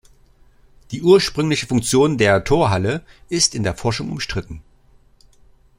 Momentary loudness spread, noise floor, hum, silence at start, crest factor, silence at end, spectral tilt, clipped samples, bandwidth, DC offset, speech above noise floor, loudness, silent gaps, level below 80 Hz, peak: 14 LU; -52 dBFS; none; 0.9 s; 18 dB; 1.15 s; -4.5 dB/octave; under 0.1%; 16 kHz; under 0.1%; 34 dB; -18 LUFS; none; -42 dBFS; -2 dBFS